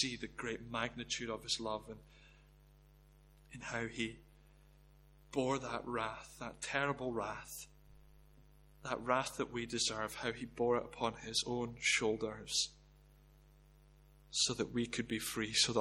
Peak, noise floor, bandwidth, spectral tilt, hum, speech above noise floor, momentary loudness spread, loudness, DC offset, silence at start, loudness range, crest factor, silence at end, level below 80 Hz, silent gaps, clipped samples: -18 dBFS; -64 dBFS; 16.5 kHz; -2.5 dB/octave; 50 Hz at -60 dBFS; 25 dB; 12 LU; -38 LUFS; under 0.1%; 0 s; 7 LU; 22 dB; 0 s; -62 dBFS; none; under 0.1%